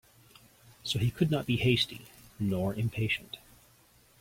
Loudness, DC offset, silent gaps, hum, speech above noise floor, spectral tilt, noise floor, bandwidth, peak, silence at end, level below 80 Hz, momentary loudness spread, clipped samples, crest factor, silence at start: -30 LUFS; under 0.1%; none; none; 32 dB; -5.5 dB/octave; -62 dBFS; 16.5 kHz; -12 dBFS; 0.85 s; -56 dBFS; 16 LU; under 0.1%; 20 dB; 0.85 s